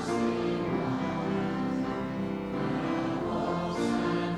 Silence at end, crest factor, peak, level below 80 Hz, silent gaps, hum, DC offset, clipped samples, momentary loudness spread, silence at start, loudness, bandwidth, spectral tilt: 0 s; 12 dB; -18 dBFS; -54 dBFS; none; none; under 0.1%; under 0.1%; 4 LU; 0 s; -31 LUFS; 12 kHz; -7 dB/octave